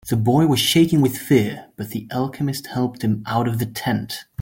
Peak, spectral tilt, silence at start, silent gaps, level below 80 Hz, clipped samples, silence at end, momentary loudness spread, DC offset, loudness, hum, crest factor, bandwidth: -4 dBFS; -5.5 dB/octave; 0.05 s; none; -52 dBFS; under 0.1%; 0 s; 11 LU; under 0.1%; -20 LUFS; none; 16 dB; 17 kHz